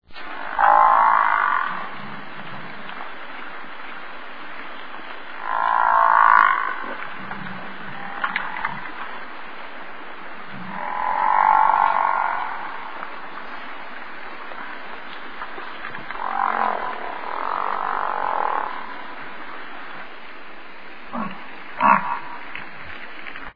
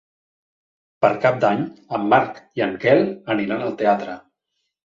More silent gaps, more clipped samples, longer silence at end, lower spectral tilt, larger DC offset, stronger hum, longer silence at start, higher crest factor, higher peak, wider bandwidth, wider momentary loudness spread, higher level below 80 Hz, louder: neither; neither; second, 0 s vs 0.65 s; about the same, -6.5 dB/octave vs -7.5 dB/octave; first, 2% vs under 0.1%; neither; second, 0 s vs 1 s; about the same, 24 dB vs 20 dB; about the same, 0 dBFS vs -2 dBFS; second, 5.2 kHz vs 7.4 kHz; first, 20 LU vs 9 LU; about the same, -58 dBFS vs -62 dBFS; about the same, -21 LUFS vs -20 LUFS